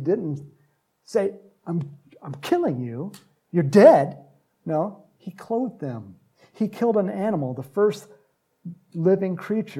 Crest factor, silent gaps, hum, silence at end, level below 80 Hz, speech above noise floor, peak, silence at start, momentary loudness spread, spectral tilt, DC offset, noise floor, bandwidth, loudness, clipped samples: 22 dB; none; none; 0 s; -74 dBFS; 43 dB; -2 dBFS; 0 s; 20 LU; -8 dB/octave; under 0.1%; -65 dBFS; 14.5 kHz; -23 LUFS; under 0.1%